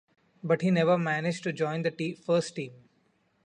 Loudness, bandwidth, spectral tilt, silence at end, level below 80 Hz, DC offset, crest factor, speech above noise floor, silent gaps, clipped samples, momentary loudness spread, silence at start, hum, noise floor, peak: -28 LUFS; 10.5 kHz; -6.5 dB/octave; 0.7 s; -72 dBFS; under 0.1%; 18 dB; 42 dB; none; under 0.1%; 14 LU; 0.45 s; none; -70 dBFS; -12 dBFS